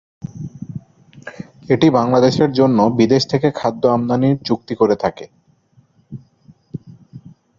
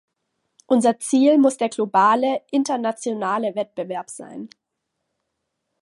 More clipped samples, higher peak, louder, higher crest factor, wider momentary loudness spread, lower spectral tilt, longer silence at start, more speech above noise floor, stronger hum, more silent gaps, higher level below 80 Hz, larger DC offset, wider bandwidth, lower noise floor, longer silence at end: neither; about the same, -2 dBFS vs -4 dBFS; first, -16 LUFS vs -20 LUFS; about the same, 16 dB vs 18 dB; first, 23 LU vs 18 LU; first, -7 dB/octave vs -4.5 dB/octave; second, 0.25 s vs 0.7 s; second, 40 dB vs 58 dB; neither; neither; first, -52 dBFS vs -78 dBFS; neither; second, 7.6 kHz vs 11.5 kHz; second, -55 dBFS vs -78 dBFS; second, 0.4 s vs 1.35 s